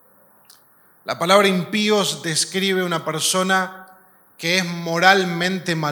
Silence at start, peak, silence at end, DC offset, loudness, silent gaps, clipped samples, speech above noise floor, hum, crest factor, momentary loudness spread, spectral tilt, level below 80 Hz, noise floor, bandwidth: 1.05 s; 0 dBFS; 0 s; under 0.1%; -19 LUFS; none; under 0.1%; 35 dB; none; 20 dB; 9 LU; -3.5 dB/octave; -70 dBFS; -54 dBFS; 19 kHz